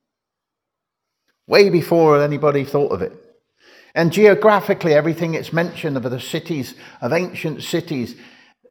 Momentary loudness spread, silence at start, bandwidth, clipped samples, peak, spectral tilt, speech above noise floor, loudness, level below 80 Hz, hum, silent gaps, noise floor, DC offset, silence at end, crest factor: 13 LU; 1.5 s; 19.5 kHz; under 0.1%; 0 dBFS; -6 dB/octave; 65 dB; -18 LUFS; -64 dBFS; none; none; -83 dBFS; under 0.1%; 0.55 s; 18 dB